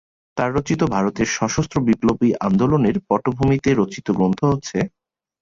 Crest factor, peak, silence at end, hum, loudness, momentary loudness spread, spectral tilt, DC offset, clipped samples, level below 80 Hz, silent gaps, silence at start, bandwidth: 16 dB; -4 dBFS; 0.55 s; none; -20 LUFS; 5 LU; -6.5 dB/octave; under 0.1%; under 0.1%; -44 dBFS; none; 0.35 s; 7.6 kHz